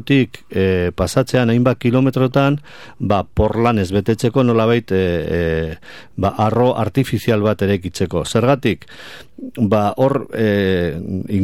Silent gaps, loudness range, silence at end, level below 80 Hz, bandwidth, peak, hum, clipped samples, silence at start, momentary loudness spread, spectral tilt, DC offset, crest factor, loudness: none; 2 LU; 0 s; -38 dBFS; 16.5 kHz; -2 dBFS; none; under 0.1%; 0 s; 9 LU; -7 dB/octave; 0.8%; 14 dB; -17 LUFS